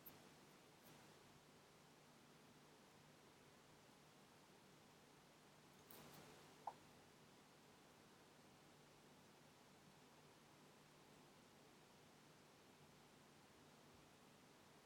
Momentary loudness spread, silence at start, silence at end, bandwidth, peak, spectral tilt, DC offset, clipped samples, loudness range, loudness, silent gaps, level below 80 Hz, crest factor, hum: 5 LU; 0 s; 0 s; 17.5 kHz; -38 dBFS; -3.5 dB/octave; under 0.1%; under 0.1%; 4 LU; -67 LUFS; none; under -90 dBFS; 30 dB; none